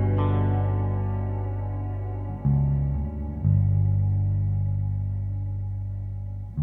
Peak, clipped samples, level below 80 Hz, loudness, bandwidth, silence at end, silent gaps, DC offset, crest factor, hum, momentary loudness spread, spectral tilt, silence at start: -10 dBFS; under 0.1%; -34 dBFS; -26 LUFS; 3.4 kHz; 0 s; none; under 0.1%; 14 dB; 50 Hz at -45 dBFS; 9 LU; -12 dB/octave; 0 s